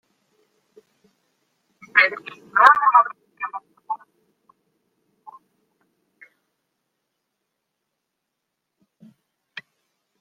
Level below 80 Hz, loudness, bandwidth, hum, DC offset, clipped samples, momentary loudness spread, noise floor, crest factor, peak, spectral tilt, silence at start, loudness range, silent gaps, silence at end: -80 dBFS; -18 LUFS; 10 kHz; none; under 0.1%; under 0.1%; 27 LU; -80 dBFS; 26 dB; 0 dBFS; -2 dB/octave; 1.95 s; 21 LU; none; 6.25 s